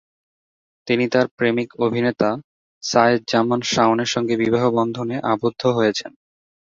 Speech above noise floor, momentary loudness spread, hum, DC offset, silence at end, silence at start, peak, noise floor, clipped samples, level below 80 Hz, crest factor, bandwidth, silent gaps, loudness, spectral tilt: over 71 dB; 7 LU; none; under 0.1%; 0.55 s; 0.85 s; -2 dBFS; under -90 dBFS; under 0.1%; -60 dBFS; 20 dB; 7.8 kHz; 1.31-1.37 s, 2.44-2.81 s; -19 LUFS; -5 dB/octave